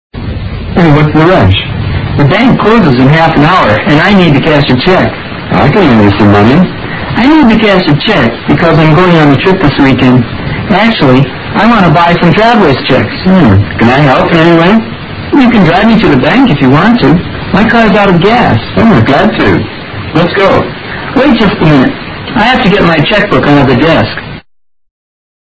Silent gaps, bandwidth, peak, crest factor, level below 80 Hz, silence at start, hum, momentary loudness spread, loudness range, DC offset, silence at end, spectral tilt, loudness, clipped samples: none; 8 kHz; 0 dBFS; 6 dB; -26 dBFS; 0.15 s; none; 8 LU; 2 LU; under 0.1%; 1.2 s; -8 dB/octave; -6 LUFS; 4%